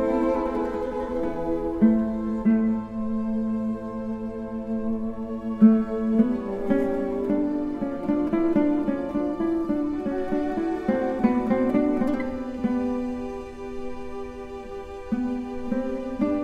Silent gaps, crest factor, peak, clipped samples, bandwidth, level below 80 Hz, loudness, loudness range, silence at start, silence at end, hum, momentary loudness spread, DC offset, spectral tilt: none; 18 dB; -6 dBFS; under 0.1%; 6.8 kHz; -46 dBFS; -25 LUFS; 7 LU; 0 s; 0 s; none; 11 LU; under 0.1%; -9 dB/octave